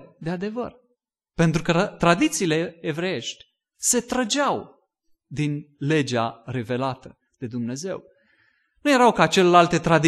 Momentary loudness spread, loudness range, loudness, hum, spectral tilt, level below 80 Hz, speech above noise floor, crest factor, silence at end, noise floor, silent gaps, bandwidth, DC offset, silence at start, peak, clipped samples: 16 LU; 6 LU; -22 LUFS; none; -4.5 dB/octave; -52 dBFS; 52 dB; 22 dB; 0 s; -74 dBFS; none; 12.5 kHz; under 0.1%; 0 s; -2 dBFS; under 0.1%